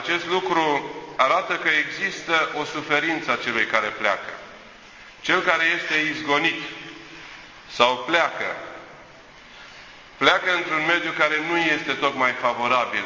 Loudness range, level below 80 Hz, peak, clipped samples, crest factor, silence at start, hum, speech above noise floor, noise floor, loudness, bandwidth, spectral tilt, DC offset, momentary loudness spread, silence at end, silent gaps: 3 LU; -62 dBFS; -2 dBFS; under 0.1%; 22 dB; 0 s; none; 24 dB; -46 dBFS; -21 LUFS; 7.6 kHz; -3 dB/octave; under 0.1%; 19 LU; 0 s; none